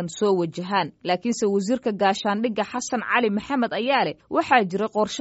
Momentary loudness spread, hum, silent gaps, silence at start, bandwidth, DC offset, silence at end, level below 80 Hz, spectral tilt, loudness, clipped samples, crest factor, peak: 6 LU; none; none; 0 s; 8 kHz; under 0.1%; 0 s; -64 dBFS; -3.5 dB/octave; -23 LUFS; under 0.1%; 20 dB; -4 dBFS